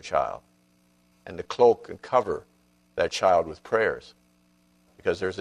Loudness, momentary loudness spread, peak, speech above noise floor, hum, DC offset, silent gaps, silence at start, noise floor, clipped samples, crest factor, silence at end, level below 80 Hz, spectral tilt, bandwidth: -25 LUFS; 17 LU; -6 dBFS; 39 dB; 60 Hz at -60 dBFS; under 0.1%; none; 0.05 s; -64 dBFS; under 0.1%; 20 dB; 0 s; -58 dBFS; -4.5 dB/octave; 11 kHz